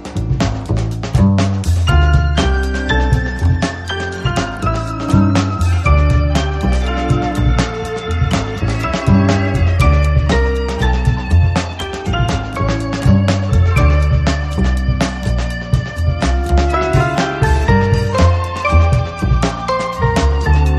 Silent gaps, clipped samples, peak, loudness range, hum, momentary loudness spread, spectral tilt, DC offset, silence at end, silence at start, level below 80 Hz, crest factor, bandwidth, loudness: none; under 0.1%; 0 dBFS; 2 LU; none; 6 LU; -6.5 dB/octave; under 0.1%; 0 s; 0 s; -18 dBFS; 14 dB; 11.5 kHz; -15 LUFS